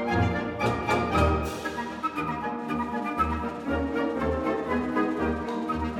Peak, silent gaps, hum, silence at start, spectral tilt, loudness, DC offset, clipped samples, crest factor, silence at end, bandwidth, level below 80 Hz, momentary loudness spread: -10 dBFS; none; none; 0 s; -6.5 dB/octave; -28 LUFS; under 0.1%; under 0.1%; 16 dB; 0 s; 17 kHz; -40 dBFS; 6 LU